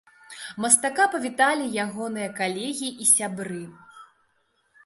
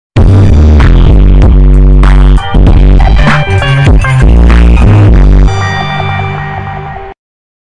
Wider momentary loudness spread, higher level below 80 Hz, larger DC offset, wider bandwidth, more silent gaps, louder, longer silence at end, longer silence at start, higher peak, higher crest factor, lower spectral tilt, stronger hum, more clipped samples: first, 18 LU vs 10 LU; second, -74 dBFS vs -6 dBFS; neither; first, 12 kHz vs 9.8 kHz; neither; second, -23 LUFS vs -6 LUFS; first, 0.8 s vs 0.55 s; first, 0.3 s vs 0.15 s; about the same, -2 dBFS vs 0 dBFS; first, 24 dB vs 4 dB; second, -2 dB/octave vs -7.5 dB/octave; neither; neither